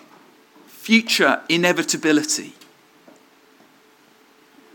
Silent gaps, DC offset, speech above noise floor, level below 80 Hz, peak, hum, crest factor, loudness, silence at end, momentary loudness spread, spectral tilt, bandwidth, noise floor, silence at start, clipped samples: none; under 0.1%; 35 dB; -80 dBFS; 0 dBFS; none; 22 dB; -18 LUFS; 2.25 s; 9 LU; -2.5 dB/octave; 18 kHz; -54 dBFS; 0.8 s; under 0.1%